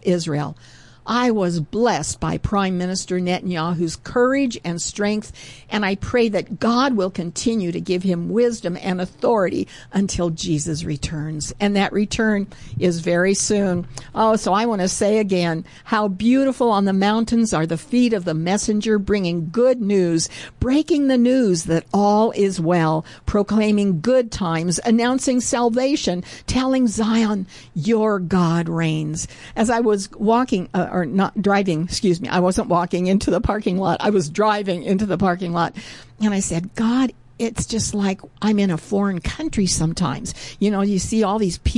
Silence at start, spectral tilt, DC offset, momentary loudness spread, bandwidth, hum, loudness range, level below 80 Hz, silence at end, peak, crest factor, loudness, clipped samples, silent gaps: 0.05 s; -5.5 dB/octave; 0.1%; 7 LU; 11.5 kHz; none; 3 LU; -40 dBFS; 0 s; -8 dBFS; 12 dB; -20 LUFS; under 0.1%; none